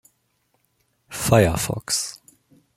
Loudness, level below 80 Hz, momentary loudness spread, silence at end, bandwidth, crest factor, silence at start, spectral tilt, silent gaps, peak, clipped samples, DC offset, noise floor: -21 LUFS; -46 dBFS; 14 LU; 0.65 s; 16.5 kHz; 22 dB; 1.1 s; -4.5 dB/octave; none; -2 dBFS; under 0.1%; under 0.1%; -69 dBFS